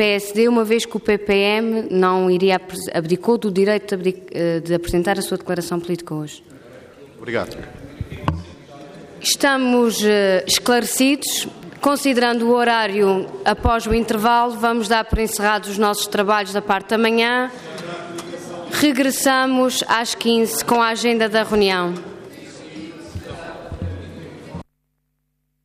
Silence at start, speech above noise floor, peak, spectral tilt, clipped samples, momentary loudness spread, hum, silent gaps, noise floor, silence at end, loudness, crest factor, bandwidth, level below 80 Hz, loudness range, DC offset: 0 s; 53 dB; -4 dBFS; -4 dB/octave; under 0.1%; 18 LU; none; none; -71 dBFS; 1 s; -18 LUFS; 16 dB; 15.5 kHz; -40 dBFS; 9 LU; under 0.1%